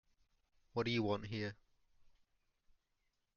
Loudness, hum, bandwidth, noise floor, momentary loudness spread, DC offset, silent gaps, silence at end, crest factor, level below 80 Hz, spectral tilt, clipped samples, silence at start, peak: -40 LUFS; none; 7 kHz; -84 dBFS; 9 LU; under 0.1%; none; 1.3 s; 20 dB; -68 dBFS; -4.5 dB/octave; under 0.1%; 0.75 s; -24 dBFS